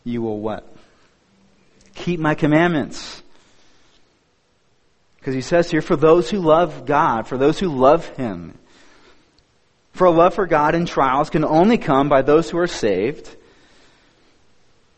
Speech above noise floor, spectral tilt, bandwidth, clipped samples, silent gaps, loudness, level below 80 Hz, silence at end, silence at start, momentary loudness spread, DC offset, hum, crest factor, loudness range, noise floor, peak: 45 dB; -6.5 dB/octave; 8.4 kHz; under 0.1%; none; -18 LUFS; -44 dBFS; 1.65 s; 0.05 s; 14 LU; under 0.1%; none; 18 dB; 6 LU; -62 dBFS; 0 dBFS